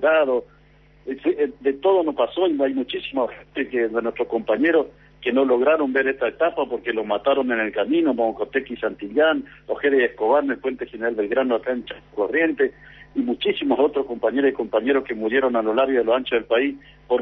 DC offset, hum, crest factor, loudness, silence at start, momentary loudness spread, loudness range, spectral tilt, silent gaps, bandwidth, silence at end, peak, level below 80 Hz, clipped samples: under 0.1%; none; 14 dB; -22 LUFS; 0 s; 8 LU; 2 LU; -7.5 dB/octave; none; 4.2 kHz; 0 s; -8 dBFS; -56 dBFS; under 0.1%